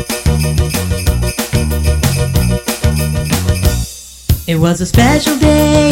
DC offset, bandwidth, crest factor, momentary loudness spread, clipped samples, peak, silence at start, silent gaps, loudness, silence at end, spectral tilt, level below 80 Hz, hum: under 0.1%; 17 kHz; 12 dB; 6 LU; under 0.1%; -2 dBFS; 0 s; none; -13 LUFS; 0 s; -5 dB/octave; -18 dBFS; none